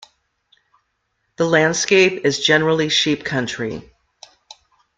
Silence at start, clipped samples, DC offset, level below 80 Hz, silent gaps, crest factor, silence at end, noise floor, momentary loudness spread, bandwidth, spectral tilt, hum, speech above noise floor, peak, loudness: 1.4 s; under 0.1%; under 0.1%; -58 dBFS; none; 20 dB; 1.15 s; -71 dBFS; 11 LU; 9.4 kHz; -3.5 dB/octave; none; 53 dB; 0 dBFS; -17 LUFS